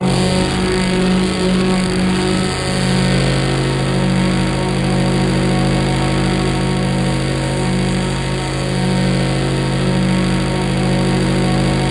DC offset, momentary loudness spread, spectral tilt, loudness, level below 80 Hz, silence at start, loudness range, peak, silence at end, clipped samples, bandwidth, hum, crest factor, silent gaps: under 0.1%; 2 LU; -5.5 dB/octave; -16 LUFS; -28 dBFS; 0 s; 2 LU; -4 dBFS; 0 s; under 0.1%; 11.5 kHz; none; 12 dB; none